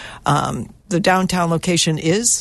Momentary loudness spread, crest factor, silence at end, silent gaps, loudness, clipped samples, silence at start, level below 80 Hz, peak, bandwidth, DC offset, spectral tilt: 7 LU; 16 dB; 0 s; none; -18 LUFS; under 0.1%; 0 s; -44 dBFS; -2 dBFS; 12.5 kHz; under 0.1%; -4 dB/octave